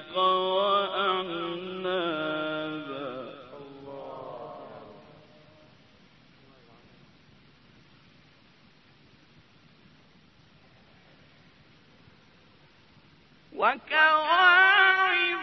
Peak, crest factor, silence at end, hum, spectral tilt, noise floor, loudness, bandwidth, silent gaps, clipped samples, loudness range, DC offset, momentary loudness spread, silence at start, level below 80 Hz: -6 dBFS; 22 dB; 0 s; none; -5 dB/octave; -59 dBFS; -24 LUFS; 6 kHz; none; under 0.1%; 24 LU; under 0.1%; 26 LU; 0 s; -72 dBFS